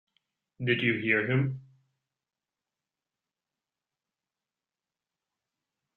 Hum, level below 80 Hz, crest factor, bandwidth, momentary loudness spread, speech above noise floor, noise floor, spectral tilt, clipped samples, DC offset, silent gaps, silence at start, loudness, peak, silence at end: none; -72 dBFS; 24 dB; 4.2 kHz; 10 LU; over 63 dB; under -90 dBFS; -9 dB/octave; under 0.1%; under 0.1%; none; 0.6 s; -28 LUFS; -10 dBFS; 4.35 s